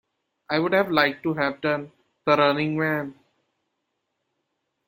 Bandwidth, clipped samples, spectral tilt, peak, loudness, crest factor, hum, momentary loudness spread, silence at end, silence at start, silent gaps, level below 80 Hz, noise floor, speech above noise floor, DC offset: 16.5 kHz; under 0.1%; -7 dB/octave; -4 dBFS; -23 LUFS; 22 dB; none; 10 LU; 1.75 s; 0.5 s; none; -66 dBFS; -78 dBFS; 55 dB; under 0.1%